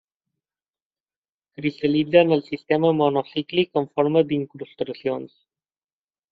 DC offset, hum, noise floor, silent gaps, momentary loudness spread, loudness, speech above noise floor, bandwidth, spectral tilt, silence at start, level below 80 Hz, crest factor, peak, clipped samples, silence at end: under 0.1%; none; under -90 dBFS; none; 12 LU; -22 LUFS; over 69 dB; 5 kHz; -5 dB/octave; 1.6 s; -66 dBFS; 20 dB; -2 dBFS; under 0.1%; 1.05 s